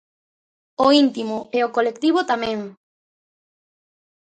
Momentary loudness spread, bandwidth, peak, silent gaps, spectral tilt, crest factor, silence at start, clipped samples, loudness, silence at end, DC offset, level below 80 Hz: 14 LU; 9.2 kHz; -2 dBFS; none; -4.5 dB/octave; 20 dB; 0.8 s; under 0.1%; -20 LUFS; 1.5 s; under 0.1%; -64 dBFS